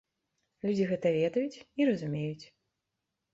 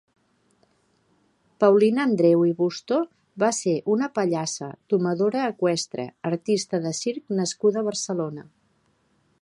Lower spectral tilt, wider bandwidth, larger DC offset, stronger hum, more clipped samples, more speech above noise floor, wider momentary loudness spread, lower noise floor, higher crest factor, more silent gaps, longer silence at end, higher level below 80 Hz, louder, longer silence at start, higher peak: first, -7.5 dB/octave vs -5 dB/octave; second, 7.8 kHz vs 11.5 kHz; neither; neither; neither; first, 55 dB vs 44 dB; about the same, 9 LU vs 10 LU; first, -85 dBFS vs -66 dBFS; about the same, 16 dB vs 20 dB; neither; about the same, 0.9 s vs 1 s; about the same, -72 dBFS vs -74 dBFS; second, -31 LUFS vs -24 LUFS; second, 0.65 s vs 1.6 s; second, -16 dBFS vs -4 dBFS